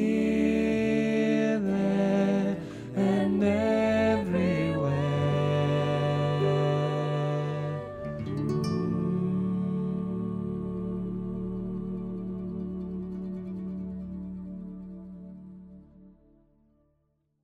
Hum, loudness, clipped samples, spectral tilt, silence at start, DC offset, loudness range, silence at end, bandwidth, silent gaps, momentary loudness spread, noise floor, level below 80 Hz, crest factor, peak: none; -28 LUFS; under 0.1%; -8 dB/octave; 0 s; under 0.1%; 13 LU; 1.35 s; 10 kHz; none; 13 LU; -73 dBFS; -52 dBFS; 16 dB; -12 dBFS